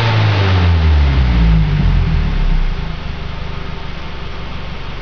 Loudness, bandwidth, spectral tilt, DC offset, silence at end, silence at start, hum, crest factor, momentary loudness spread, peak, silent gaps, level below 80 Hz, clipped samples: -15 LUFS; 5.4 kHz; -7.5 dB/octave; under 0.1%; 0 s; 0 s; none; 10 dB; 14 LU; -4 dBFS; none; -16 dBFS; under 0.1%